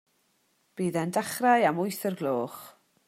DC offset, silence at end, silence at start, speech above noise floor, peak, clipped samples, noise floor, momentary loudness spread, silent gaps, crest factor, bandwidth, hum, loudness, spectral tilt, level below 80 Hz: under 0.1%; 0.35 s; 0.75 s; 44 dB; -10 dBFS; under 0.1%; -71 dBFS; 15 LU; none; 20 dB; 16 kHz; none; -27 LUFS; -5 dB/octave; -76 dBFS